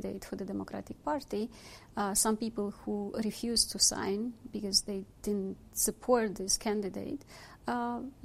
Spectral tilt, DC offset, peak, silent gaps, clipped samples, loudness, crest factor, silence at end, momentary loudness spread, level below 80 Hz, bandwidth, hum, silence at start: -2.5 dB/octave; under 0.1%; -12 dBFS; none; under 0.1%; -32 LUFS; 22 dB; 0 s; 13 LU; -56 dBFS; 15.5 kHz; none; 0 s